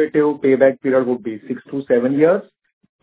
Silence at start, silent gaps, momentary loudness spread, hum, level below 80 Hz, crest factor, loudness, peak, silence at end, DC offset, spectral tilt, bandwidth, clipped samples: 0 s; none; 12 LU; none; -64 dBFS; 16 dB; -17 LUFS; 0 dBFS; 0.6 s; under 0.1%; -11.5 dB/octave; 4 kHz; under 0.1%